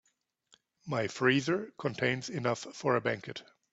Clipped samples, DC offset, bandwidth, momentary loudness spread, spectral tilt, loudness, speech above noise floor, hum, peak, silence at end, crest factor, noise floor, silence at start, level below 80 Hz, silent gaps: under 0.1%; under 0.1%; 8 kHz; 12 LU; -5 dB/octave; -32 LUFS; 42 dB; none; -12 dBFS; 0.3 s; 22 dB; -74 dBFS; 0.85 s; -72 dBFS; none